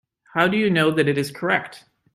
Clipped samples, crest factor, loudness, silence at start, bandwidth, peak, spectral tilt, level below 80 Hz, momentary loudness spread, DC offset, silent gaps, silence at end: under 0.1%; 18 dB; -21 LUFS; 0.35 s; 15.5 kHz; -4 dBFS; -6 dB/octave; -62 dBFS; 8 LU; under 0.1%; none; 0.35 s